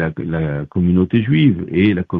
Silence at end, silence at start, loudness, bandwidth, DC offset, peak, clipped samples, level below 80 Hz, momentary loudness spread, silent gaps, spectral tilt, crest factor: 0 s; 0 s; -16 LUFS; 4.3 kHz; under 0.1%; -2 dBFS; under 0.1%; -40 dBFS; 7 LU; none; -10.5 dB/octave; 14 dB